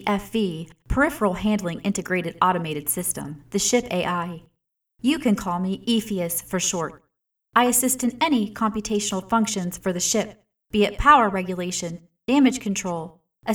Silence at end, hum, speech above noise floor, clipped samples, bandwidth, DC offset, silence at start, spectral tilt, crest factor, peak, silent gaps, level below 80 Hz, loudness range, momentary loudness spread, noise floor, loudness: 0 s; none; 53 dB; under 0.1%; over 20 kHz; under 0.1%; 0 s; -4 dB/octave; 22 dB; -2 dBFS; none; -42 dBFS; 3 LU; 10 LU; -76 dBFS; -23 LUFS